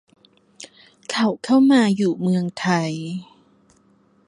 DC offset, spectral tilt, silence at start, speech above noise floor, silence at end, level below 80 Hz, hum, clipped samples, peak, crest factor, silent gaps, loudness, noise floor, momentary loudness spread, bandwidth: under 0.1%; -6 dB/octave; 0.6 s; 39 dB; 1.05 s; -68 dBFS; none; under 0.1%; -4 dBFS; 16 dB; none; -20 LUFS; -58 dBFS; 26 LU; 11 kHz